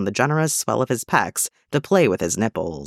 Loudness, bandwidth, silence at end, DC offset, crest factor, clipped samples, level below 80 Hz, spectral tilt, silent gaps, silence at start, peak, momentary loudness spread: -21 LUFS; 16.5 kHz; 0 s; under 0.1%; 18 dB; under 0.1%; -54 dBFS; -4.5 dB/octave; none; 0 s; -2 dBFS; 6 LU